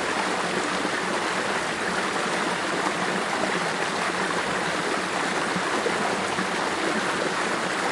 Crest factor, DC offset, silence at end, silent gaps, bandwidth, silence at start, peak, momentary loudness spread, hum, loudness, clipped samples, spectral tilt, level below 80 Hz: 16 dB; under 0.1%; 0 s; none; 11.5 kHz; 0 s; -10 dBFS; 1 LU; none; -25 LUFS; under 0.1%; -3 dB/octave; -62 dBFS